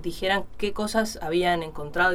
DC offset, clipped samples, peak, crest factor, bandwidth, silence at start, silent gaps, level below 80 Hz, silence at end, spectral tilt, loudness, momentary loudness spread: under 0.1%; under 0.1%; -8 dBFS; 16 dB; 16.5 kHz; 0 s; none; -44 dBFS; 0 s; -4 dB/octave; -26 LUFS; 6 LU